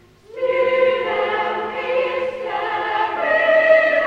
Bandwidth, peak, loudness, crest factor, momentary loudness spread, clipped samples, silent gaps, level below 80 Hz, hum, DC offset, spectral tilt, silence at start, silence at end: 7.2 kHz; -4 dBFS; -18 LUFS; 14 dB; 11 LU; under 0.1%; none; -58 dBFS; none; under 0.1%; -4.5 dB/octave; 0.3 s; 0 s